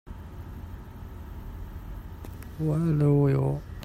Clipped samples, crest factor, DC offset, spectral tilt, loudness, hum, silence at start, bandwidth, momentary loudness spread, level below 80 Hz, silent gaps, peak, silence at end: under 0.1%; 16 dB; under 0.1%; -9.5 dB/octave; -25 LUFS; none; 0.05 s; 15 kHz; 20 LU; -42 dBFS; none; -12 dBFS; 0 s